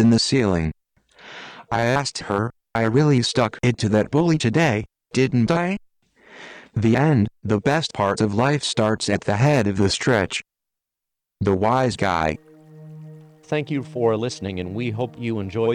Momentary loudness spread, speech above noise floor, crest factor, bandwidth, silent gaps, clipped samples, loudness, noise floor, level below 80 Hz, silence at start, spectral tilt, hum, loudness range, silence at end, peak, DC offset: 11 LU; 64 dB; 14 dB; 11 kHz; none; under 0.1%; -21 LUFS; -84 dBFS; -48 dBFS; 0 s; -5.5 dB/octave; none; 5 LU; 0 s; -6 dBFS; under 0.1%